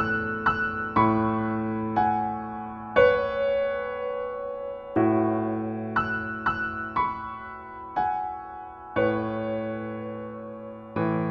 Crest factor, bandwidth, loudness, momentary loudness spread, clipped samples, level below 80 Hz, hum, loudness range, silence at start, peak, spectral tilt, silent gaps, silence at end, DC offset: 20 dB; 5.8 kHz; -27 LUFS; 14 LU; under 0.1%; -52 dBFS; none; 6 LU; 0 s; -8 dBFS; -9 dB/octave; none; 0 s; under 0.1%